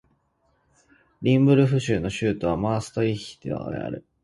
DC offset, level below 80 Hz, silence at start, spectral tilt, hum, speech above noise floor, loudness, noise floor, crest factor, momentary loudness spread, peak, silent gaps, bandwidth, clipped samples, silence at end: under 0.1%; -50 dBFS; 1.2 s; -7 dB/octave; none; 45 dB; -24 LUFS; -68 dBFS; 18 dB; 14 LU; -6 dBFS; none; 11.5 kHz; under 0.1%; 0.25 s